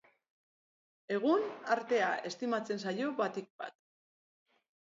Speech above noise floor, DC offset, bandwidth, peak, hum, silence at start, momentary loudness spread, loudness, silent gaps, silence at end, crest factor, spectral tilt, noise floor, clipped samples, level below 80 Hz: over 56 dB; under 0.1%; 7.6 kHz; -16 dBFS; none; 1.1 s; 13 LU; -34 LUFS; 3.50-3.59 s; 1.25 s; 20 dB; -3 dB/octave; under -90 dBFS; under 0.1%; -88 dBFS